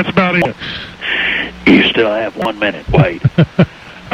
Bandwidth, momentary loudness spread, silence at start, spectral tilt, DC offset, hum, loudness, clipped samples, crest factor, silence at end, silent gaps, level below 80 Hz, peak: 9.2 kHz; 10 LU; 0 s; -7.5 dB/octave; under 0.1%; none; -13 LUFS; under 0.1%; 14 dB; 0 s; none; -34 dBFS; 0 dBFS